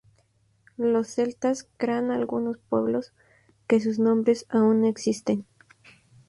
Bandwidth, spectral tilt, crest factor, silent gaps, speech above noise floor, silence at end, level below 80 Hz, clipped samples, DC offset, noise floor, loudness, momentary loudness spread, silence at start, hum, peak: 11.5 kHz; -6 dB/octave; 16 dB; none; 41 dB; 0.85 s; -68 dBFS; under 0.1%; under 0.1%; -65 dBFS; -25 LUFS; 8 LU; 0.8 s; none; -10 dBFS